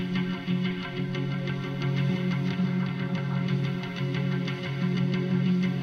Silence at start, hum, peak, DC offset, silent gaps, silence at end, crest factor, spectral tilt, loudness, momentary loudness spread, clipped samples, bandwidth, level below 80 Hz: 0 s; none; -16 dBFS; under 0.1%; none; 0 s; 12 dB; -8 dB/octave; -28 LUFS; 5 LU; under 0.1%; 6.6 kHz; -60 dBFS